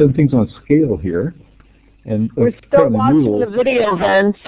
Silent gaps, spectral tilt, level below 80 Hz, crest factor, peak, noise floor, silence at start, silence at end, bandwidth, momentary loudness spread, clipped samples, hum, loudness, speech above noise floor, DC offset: none; -11.5 dB/octave; -40 dBFS; 14 dB; 0 dBFS; -48 dBFS; 0 s; 0.15 s; 4 kHz; 8 LU; under 0.1%; none; -15 LUFS; 34 dB; under 0.1%